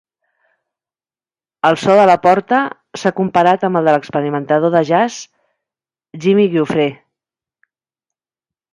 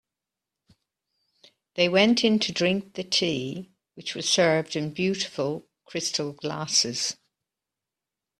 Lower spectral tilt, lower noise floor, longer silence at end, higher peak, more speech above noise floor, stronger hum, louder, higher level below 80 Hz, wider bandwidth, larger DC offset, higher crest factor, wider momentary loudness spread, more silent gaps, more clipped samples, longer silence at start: first, -6 dB/octave vs -3.5 dB/octave; about the same, under -90 dBFS vs -88 dBFS; first, 1.8 s vs 1.25 s; first, 0 dBFS vs -6 dBFS; first, over 77 dB vs 63 dB; neither; first, -14 LUFS vs -25 LUFS; first, -62 dBFS vs -68 dBFS; second, 11.5 kHz vs 13.5 kHz; neither; second, 16 dB vs 22 dB; second, 10 LU vs 15 LU; neither; neither; about the same, 1.65 s vs 1.75 s